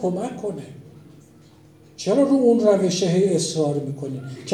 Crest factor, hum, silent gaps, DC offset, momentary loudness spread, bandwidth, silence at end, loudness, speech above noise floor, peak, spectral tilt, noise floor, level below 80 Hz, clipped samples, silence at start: 16 dB; none; none; under 0.1%; 15 LU; 12.5 kHz; 0 s; -21 LUFS; 29 dB; -6 dBFS; -6 dB/octave; -50 dBFS; -66 dBFS; under 0.1%; 0 s